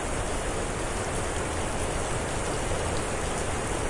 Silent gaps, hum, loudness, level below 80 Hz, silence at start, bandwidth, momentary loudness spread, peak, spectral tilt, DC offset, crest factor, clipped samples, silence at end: none; none; -30 LUFS; -36 dBFS; 0 s; 11.5 kHz; 1 LU; -14 dBFS; -4 dB/octave; under 0.1%; 14 dB; under 0.1%; 0 s